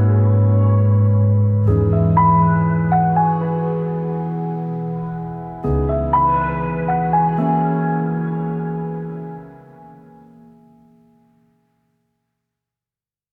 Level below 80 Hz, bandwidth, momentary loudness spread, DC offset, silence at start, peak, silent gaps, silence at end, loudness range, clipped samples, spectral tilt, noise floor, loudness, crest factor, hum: -38 dBFS; 3.1 kHz; 11 LU; under 0.1%; 0 s; -4 dBFS; none; 3.45 s; 13 LU; under 0.1%; -12.5 dB/octave; under -90 dBFS; -18 LUFS; 14 dB; none